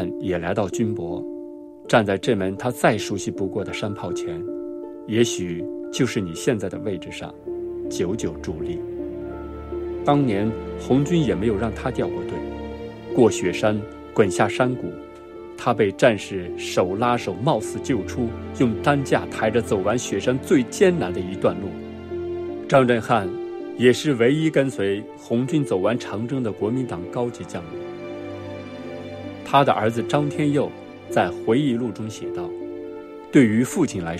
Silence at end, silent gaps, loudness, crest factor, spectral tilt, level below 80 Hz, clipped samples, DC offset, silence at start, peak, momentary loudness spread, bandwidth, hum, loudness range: 0 s; none; -23 LUFS; 20 dB; -6 dB/octave; -50 dBFS; under 0.1%; under 0.1%; 0 s; -4 dBFS; 14 LU; 14.5 kHz; none; 5 LU